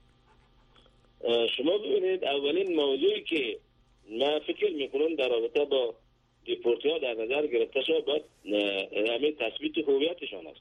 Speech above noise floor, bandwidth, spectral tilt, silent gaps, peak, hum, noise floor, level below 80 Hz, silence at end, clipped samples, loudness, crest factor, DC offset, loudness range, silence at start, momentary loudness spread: 34 dB; 9.6 kHz; -5 dB/octave; none; -16 dBFS; none; -62 dBFS; -68 dBFS; 0.1 s; under 0.1%; -29 LUFS; 14 dB; under 0.1%; 1 LU; 1.2 s; 6 LU